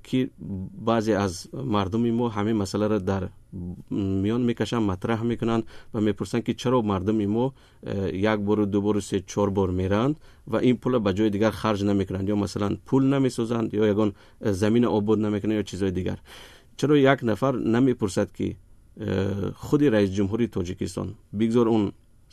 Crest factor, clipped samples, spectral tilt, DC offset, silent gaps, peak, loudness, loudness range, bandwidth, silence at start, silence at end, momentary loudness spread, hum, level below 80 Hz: 18 dB; under 0.1%; -7 dB/octave; under 0.1%; none; -6 dBFS; -25 LUFS; 2 LU; 13.5 kHz; 0.05 s; 0.4 s; 10 LU; none; -52 dBFS